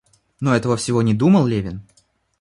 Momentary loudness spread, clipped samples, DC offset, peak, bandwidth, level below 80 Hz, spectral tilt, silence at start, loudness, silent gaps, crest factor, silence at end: 12 LU; under 0.1%; under 0.1%; -4 dBFS; 11.5 kHz; -48 dBFS; -6.5 dB/octave; 0.4 s; -18 LUFS; none; 14 dB; 0.6 s